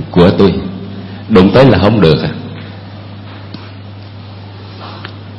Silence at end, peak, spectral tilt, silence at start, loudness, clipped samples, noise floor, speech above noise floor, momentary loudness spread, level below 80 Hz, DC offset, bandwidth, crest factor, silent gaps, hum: 0 s; 0 dBFS; -8.5 dB/octave; 0 s; -9 LUFS; 0.5%; -29 dBFS; 22 dB; 23 LU; -34 dBFS; under 0.1%; 7.2 kHz; 12 dB; none; none